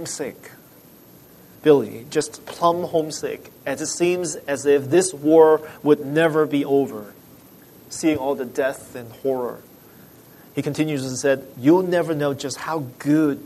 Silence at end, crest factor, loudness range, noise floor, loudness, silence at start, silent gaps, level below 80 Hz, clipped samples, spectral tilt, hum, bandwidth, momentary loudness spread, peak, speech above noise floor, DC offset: 0 s; 20 dB; 8 LU; -48 dBFS; -21 LUFS; 0 s; none; -64 dBFS; under 0.1%; -5 dB/octave; none; 13.5 kHz; 13 LU; -2 dBFS; 27 dB; under 0.1%